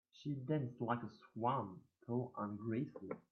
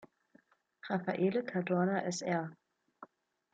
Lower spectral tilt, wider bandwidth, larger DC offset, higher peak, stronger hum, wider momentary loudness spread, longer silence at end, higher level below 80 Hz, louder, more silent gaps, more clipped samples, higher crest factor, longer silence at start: first, -7.5 dB/octave vs -6 dB/octave; second, 6.6 kHz vs 9.2 kHz; neither; about the same, -22 dBFS vs -20 dBFS; neither; first, 11 LU vs 8 LU; second, 0.1 s vs 0.5 s; about the same, -82 dBFS vs -82 dBFS; second, -43 LUFS vs -34 LUFS; neither; neither; about the same, 20 dB vs 16 dB; second, 0.15 s vs 0.85 s